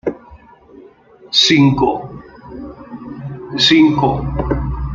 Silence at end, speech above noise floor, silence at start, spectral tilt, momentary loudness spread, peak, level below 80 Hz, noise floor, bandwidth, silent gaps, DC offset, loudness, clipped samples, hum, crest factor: 0 s; 30 dB; 0.05 s; -5 dB/octave; 23 LU; 0 dBFS; -32 dBFS; -43 dBFS; 7.6 kHz; none; under 0.1%; -14 LUFS; under 0.1%; none; 16 dB